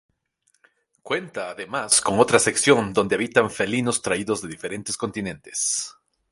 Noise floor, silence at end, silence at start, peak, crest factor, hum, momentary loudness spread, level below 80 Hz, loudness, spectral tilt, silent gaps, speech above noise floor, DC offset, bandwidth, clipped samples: -69 dBFS; 0.4 s; 1.05 s; 0 dBFS; 22 dB; none; 14 LU; -58 dBFS; -22 LUFS; -3 dB/octave; none; 46 dB; under 0.1%; 11.5 kHz; under 0.1%